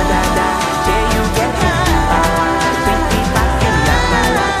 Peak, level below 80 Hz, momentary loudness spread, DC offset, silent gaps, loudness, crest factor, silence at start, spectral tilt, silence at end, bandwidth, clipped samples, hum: 0 dBFS; -20 dBFS; 2 LU; under 0.1%; none; -14 LUFS; 14 dB; 0 s; -4.5 dB/octave; 0 s; 15.5 kHz; under 0.1%; none